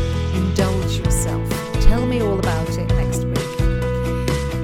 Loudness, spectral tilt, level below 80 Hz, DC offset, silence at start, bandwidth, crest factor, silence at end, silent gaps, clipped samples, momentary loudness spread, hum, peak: -20 LUFS; -6 dB/octave; -24 dBFS; under 0.1%; 0 s; 17 kHz; 18 dB; 0 s; none; under 0.1%; 3 LU; none; 0 dBFS